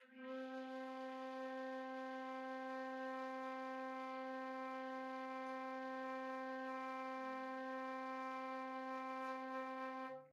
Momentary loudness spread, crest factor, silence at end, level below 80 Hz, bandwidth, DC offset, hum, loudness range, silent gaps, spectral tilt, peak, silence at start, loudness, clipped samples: 2 LU; 12 dB; 0 s; under -90 dBFS; 12 kHz; under 0.1%; none; 1 LU; none; -3.5 dB/octave; -34 dBFS; 0 s; -47 LUFS; under 0.1%